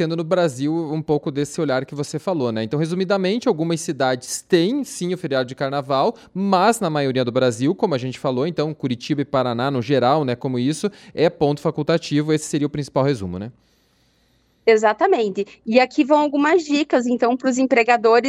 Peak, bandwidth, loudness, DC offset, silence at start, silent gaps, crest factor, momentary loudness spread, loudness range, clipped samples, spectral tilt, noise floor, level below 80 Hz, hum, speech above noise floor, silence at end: -2 dBFS; 15 kHz; -20 LUFS; under 0.1%; 0 s; none; 18 dB; 7 LU; 4 LU; under 0.1%; -5.5 dB/octave; -61 dBFS; -60 dBFS; none; 42 dB; 0 s